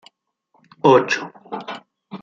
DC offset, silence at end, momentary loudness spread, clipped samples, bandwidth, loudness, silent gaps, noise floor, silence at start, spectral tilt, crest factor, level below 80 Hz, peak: under 0.1%; 0.05 s; 21 LU; under 0.1%; 7.6 kHz; -17 LUFS; none; -65 dBFS; 0.85 s; -5.5 dB/octave; 20 dB; -66 dBFS; -2 dBFS